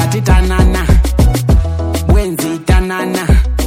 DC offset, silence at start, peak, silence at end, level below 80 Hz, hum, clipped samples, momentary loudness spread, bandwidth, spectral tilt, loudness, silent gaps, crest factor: under 0.1%; 0 s; 0 dBFS; 0 s; -12 dBFS; none; under 0.1%; 5 LU; 16.5 kHz; -6 dB/octave; -13 LUFS; none; 10 dB